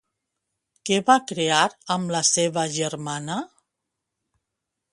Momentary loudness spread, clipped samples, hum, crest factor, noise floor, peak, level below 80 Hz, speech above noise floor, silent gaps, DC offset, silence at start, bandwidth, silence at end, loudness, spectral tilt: 12 LU; under 0.1%; none; 22 dB; -83 dBFS; -2 dBFS; -70 dBFS; 60 dB; none; under 0.1%; 0.85 s; 11.5 kHz; 1.45 s; -22 LUFS; -3 dB/octave